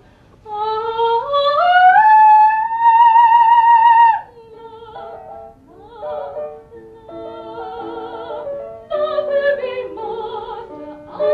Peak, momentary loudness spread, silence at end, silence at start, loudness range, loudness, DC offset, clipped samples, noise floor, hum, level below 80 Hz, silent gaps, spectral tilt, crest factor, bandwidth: -2 dBFS; 24 LU; 0 s; 0.45 s; 20 LU; -12 LUFS; under 0.1%; under 0.1%; -42 dBFS; none; -56 dBFS; none; -4.5 dB/octave; 14 dB; 4.8 kHz